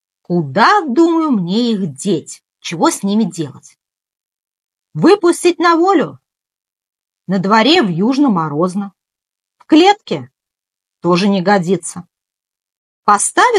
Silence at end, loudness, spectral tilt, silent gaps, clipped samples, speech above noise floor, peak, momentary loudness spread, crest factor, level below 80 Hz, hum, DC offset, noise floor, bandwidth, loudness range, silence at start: 0 s; -13 LUFS; -4.5 dB/octave; 12.77-13.03 s; under 0.1%; 73 dB; 0 dBFS; 14 LU; 14 dB; -70 dBFS; none; under 0.1%; -86 dBFS; 12.5 kHz; 4 LU; 0.3 s